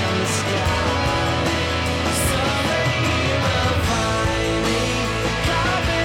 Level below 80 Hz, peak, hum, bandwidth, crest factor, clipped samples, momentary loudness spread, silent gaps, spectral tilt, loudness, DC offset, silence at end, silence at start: -32 dBFS; -12 dBFS; none; 17 kHz; 8 dB; under 0.1%; 2 LU; none; -4 dB/octave; -20 LUFS; under 0.1%; 0 s; 0 s